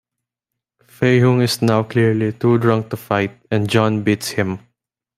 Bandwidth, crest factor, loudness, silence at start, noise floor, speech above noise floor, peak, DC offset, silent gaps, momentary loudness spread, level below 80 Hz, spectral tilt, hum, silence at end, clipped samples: 15.5 kHz; 16 dB; -17 LUFS; 1 s; -82 dBFS; 66 dB; -2 dBFS; under 0.1%; none; 7 LU; -56 dBFS; -6.5 dB/octave; none; 0.6 s; under 0.1%